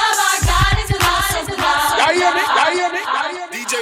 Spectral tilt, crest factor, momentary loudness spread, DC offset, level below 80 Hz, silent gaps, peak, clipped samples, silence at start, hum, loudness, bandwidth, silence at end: -3 dB/octave; 14 dB; 6 LU; under 0.1%; -28 dBFS; none; -4 dBFS; under 0.1%; 0 s; none; -16 LUFS; 17 kHz; 0 s